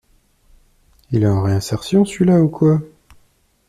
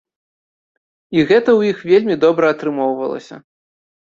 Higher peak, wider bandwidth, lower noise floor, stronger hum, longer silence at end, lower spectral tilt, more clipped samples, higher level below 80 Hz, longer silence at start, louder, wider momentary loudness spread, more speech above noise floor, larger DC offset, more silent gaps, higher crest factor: about the same, -4 dBFS vs -2 dBFS; first, 14 kHz vs 7.4 kHz; second, -58 dBFS vs under -90 dBFS; neither; about the same, 0.8 s vs 0.75 s; about the same, -7.5 dB/octave vs -7 dB/octave; neither; first, -46 dBFS vs -60 dBFS; about the same, 1.1 s vs 1.1 s; about the same, -17 LUFS vs -15 LUFS; second, 7 LU vs 10 LU; second, 43 dB vs over 75 dB; neither; neither; about the same, 14 dB vs 16 dB